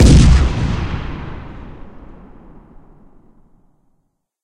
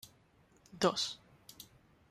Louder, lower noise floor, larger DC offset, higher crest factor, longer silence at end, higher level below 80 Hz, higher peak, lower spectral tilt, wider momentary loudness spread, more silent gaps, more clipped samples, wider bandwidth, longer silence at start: first, -15 LUFS vs -34 LUFS; about the same, -65 dBFS vs -67 dBFS; neither; second, 16 dB vs 24 dB; first, 2.55 s vs 0.45 s; first, -18 dBFS vs -72 dBFS; first, 0 dBFS vs -16 dBFS; first, -6 dB/octave vs -3.5 dB/octave; about the same, 27 LU vs 25 LU; neither; neither; second, 10.5 kHz vs 15 kHz; about the same, 0 s vs 0.05 s